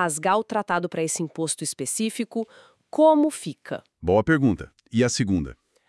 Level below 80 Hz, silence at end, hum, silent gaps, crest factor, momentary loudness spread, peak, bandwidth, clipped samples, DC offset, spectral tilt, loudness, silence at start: -52 dBFS; 0.35 s; none; none; 18 dB; 14 LU; -6 dBFS; 12 kHz; under 0.1%; under 0.1%; -5 dB/octave; -24 LUFS; 0 s